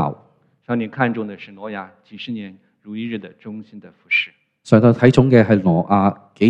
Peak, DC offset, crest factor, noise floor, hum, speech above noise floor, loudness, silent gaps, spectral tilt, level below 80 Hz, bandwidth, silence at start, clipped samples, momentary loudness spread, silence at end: 0 dBFS; under 0.1%; 18 dB; -54 dBFS; none; 37 dB; -16 LUFS; none; -8 dB/octave; -52 dBFS; 9.2 kHz; 0 s; under 0.1%; 21 LU; 0 s